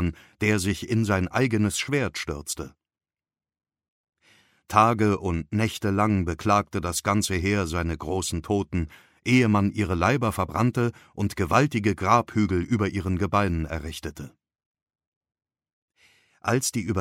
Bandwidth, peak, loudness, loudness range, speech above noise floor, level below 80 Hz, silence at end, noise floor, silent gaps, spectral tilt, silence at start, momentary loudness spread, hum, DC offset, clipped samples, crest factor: 16 kHz; -4 dBFS; -25 LUFS; 7 LU; over 66 dB; -44 dBFS; 0 s; under -90 dBFS; 3.88-4.04 s, 14.66-14.74 s, 14.82-14.86 s, 15.07-15.21 s, 15.73-15.88 s; -5.5 dB/octave; 0 s; 10 LU; none; under 0.1%; under 0.1%; 22 dB